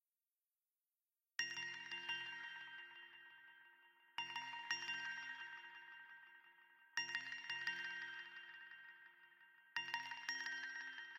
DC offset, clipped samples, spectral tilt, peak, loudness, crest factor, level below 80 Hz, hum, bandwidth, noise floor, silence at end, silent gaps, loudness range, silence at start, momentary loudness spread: under 0.1%; under 0.1%; 0.5 dB/octave; -26 dBFS; -47 LUFS; 24 dB; under -90 dBFS; none; 16 kHz; under -90 dBFS; 0 s; none; 2 LU; 1.4 s; 19 LU